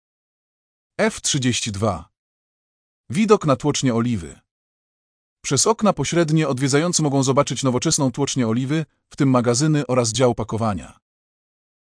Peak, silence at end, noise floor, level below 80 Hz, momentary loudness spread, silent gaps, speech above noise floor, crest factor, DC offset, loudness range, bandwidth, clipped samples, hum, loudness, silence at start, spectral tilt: -2 dBFS; 0.9 s; under -90 dBFS; -52 dBFS; 8 LU; 2.19-3.04 s, 4.51-5.37 s; over 71 dB; 18 dB; under 0.1%; 4 LU; 10.5 kHz; under 0.1%; none; -20 LUFS; 1 s; -4.5 dB/octave